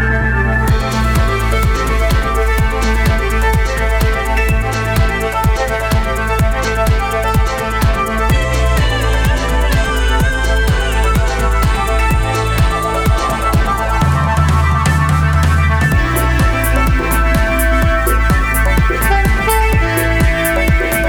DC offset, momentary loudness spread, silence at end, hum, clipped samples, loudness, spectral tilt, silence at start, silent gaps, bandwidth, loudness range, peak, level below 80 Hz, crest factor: under 0.1%; 2 LU; 0 s; none; under 0.1%; -14 LUFS; -5.5 dB/octave; 0 s; none; 19 kHz; 2 LU; -2 dBFS; -16 dBFS; 10 dB